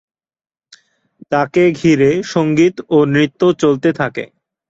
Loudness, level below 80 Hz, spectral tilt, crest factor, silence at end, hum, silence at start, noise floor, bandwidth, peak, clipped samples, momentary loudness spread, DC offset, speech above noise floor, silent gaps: -14 LUFS; -52 dBFS; -6.5 dB/octave; 14 dB; 0.45 s; none; 1.3 s; -49 dBFS; 7.8 kHz; -2 dBFS; under 0.1%; 8 LU; under 0.1%; 36 dB; none